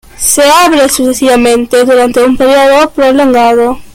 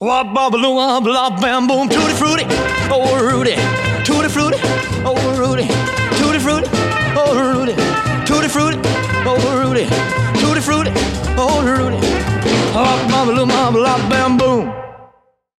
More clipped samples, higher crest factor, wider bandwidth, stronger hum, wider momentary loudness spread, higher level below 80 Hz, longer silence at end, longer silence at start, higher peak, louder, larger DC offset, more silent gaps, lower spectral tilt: first, 0.2% vs under 0.1%; second, 6 dB vs 12 dB; first, over 20 kHz vs 15 kHz; neither; about the same, 3 LU vs 3 LU; about the same, -36 dBFS vs -34 dBFS; second, 0.1 s vs 0.55 s; first, 0.2 s vs 0 s; first, 0 dBFS vs -4 dBFS; first, -6 LUFS vs -15 LUFS; neither; neither; second, -2 dB/octave vs -5 dB/octave